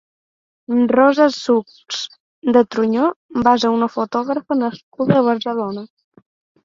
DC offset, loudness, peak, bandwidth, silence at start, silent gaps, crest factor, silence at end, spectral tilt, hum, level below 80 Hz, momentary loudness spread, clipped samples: under 0.1%; -17 LUFS; 0 dBFS; 7.6 kHz; 0.7 s; 2.20-2.42 s, 3.16-3.29 s, 4.83-4.92 s; 18 dB; 0.8 s; -6 dB/octave; none; -56 dBFS; 12 LU; under 0.1%